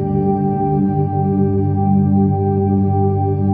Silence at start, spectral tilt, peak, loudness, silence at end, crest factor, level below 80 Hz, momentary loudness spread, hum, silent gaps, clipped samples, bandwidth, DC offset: 0 s; -15 dB/octave; -4 dBFS; -16 LUFS; 0 s; 10 dB; -40 dBFS; 3 LU; 50 Hz at -35 dBFS; none; under 0.1%; 2.5 kHz; under 0.1%